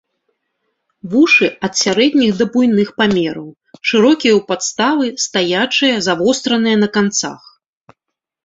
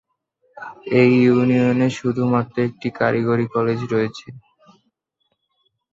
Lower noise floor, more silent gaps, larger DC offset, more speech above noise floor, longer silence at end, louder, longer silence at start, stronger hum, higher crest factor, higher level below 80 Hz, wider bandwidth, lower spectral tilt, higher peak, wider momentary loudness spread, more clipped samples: first, -78 dBFS vs -72 dBFS; neither; neither; first, 64 dB vs 54 dB; second, 1.1 s vs 1.55 s; first, -14 LUFS vs -18 LUFS; first, 1.05 s vs 0.55 s; neither; about the same, 14 dB vs 18 dB; about the same, -56 dBFS vs -58 dBFS; about the same, 8 kHz vs 7.6 kHz; second, -3.5 dB/octave vs -7.5 dB/octave; about the same, -2 dBFS vs -2 dBFS; second, 8 LU vs 14 LU; neither